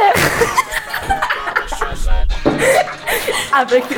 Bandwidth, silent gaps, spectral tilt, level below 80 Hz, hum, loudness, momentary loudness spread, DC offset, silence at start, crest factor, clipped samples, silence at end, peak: 19 kHz; none; -3.5 dB/octave; -22 dBFS; none; -16 LUFS; 8 LU; under 0.1%; 0 s; 14 dB; under 0.1%; 0 s; 0 dBFS